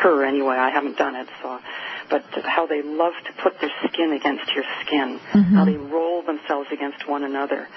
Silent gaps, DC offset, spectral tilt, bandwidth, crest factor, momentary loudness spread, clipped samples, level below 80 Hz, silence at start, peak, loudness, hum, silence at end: none; under 0.1%; -4 dB/octave; 6 kHz; 16 dB; 11 LU; under 0.1%; -60 dBFS; 0 s; -6 dBFS; -22 LUFS; none; 0 s